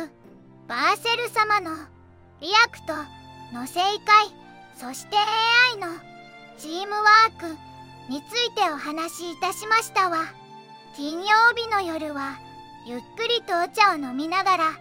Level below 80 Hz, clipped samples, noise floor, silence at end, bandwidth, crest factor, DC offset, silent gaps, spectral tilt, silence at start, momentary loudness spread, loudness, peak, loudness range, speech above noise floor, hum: -68 dBFS; under 0.1%; -49 dBFS; 0 s; 16.5 kHz; 22 dB; under 0.1%; none; -2 dB/octave; 0 s; 19 LU; -21 LUFS; -2 dBFS; 4 LU; 27 dB; none